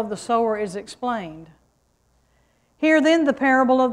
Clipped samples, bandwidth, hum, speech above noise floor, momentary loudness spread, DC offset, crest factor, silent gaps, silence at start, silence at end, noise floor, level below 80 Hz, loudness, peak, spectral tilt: under 0.1%; 11.5 kHz; none; 44 dB; 13 LU; under 0.1%; 16 dB; none; 0 s; 0 s; -64 dBFS; -60 dBFS; -20 LUFS; -6 dBFS; -4.5 dB/octave